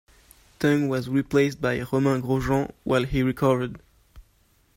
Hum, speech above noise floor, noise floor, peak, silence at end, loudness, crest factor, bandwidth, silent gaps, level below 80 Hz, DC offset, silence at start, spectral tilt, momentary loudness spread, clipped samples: none; 39 dB; -62 dBFS; -8 dBFS; 0.55 s; -24 LUFS; 18 dB; 16 kHz; none; -46 dBFS; under 0.1%; 0.6 s; -7 dB/octave; 4 LU; under 0.1%